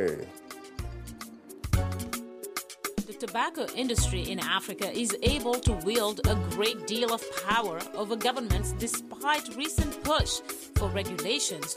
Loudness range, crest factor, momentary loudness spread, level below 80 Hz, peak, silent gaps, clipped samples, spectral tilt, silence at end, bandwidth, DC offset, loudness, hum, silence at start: 5 LU; 18 dB; 13 LU; -38 dBFS; -14 dBFS; none; under 0.1%; -4 dB/octave; 0 s; 16 kHz; under 0.1%; -30 LUFS; none; 0 s